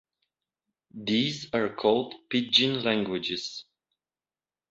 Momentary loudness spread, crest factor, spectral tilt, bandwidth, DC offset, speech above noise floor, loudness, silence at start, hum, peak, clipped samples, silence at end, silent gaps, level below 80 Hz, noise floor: 12 LU; 24 dB; -4.5 dB/octave; 8 kHz; under 0.1%; over 63 dB; -26 LUFS; 0.95 s; none; -6 dBFS; under 0.1%; 1.1 s; none; -68 dBFS; under -90 dBFS